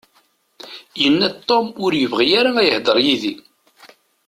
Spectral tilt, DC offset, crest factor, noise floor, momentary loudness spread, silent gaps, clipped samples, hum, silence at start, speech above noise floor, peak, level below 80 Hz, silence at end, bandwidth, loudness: -4.5 dB/octave; under 0.1%; 16 dB; -60 dBFS; 18 LU; none; under 0.1%; none; 0.65 s; 43 dB; -2 dBFS; -60 dBFS; 0.9 s; 15 kHz; -16 LUFS